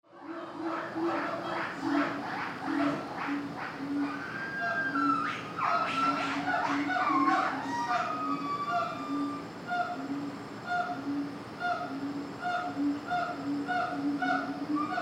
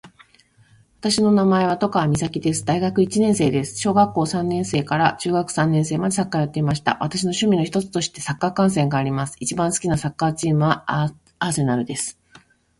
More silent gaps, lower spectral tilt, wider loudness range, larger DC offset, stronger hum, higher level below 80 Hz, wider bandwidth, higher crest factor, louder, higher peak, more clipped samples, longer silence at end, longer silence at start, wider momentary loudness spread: neither; about the same, -5.5 dB/octave vs -5.5 dB/octave; first, 5 LU vs 2 LU; neither; neither; second, -70 dBFS vs -50 dBFS; about the same, 11 kHz vs 11.5 kHz; about the same, 18 dB vs 18 dB; second, -32 LUFS vs -21 LUFS; second, -14 dBFS vs -4 dBFS; neither; second, 0 s vs 0.65 s; about the same, 0.1 s vs 0.05 s; about the same, 8 LU vs 6 LU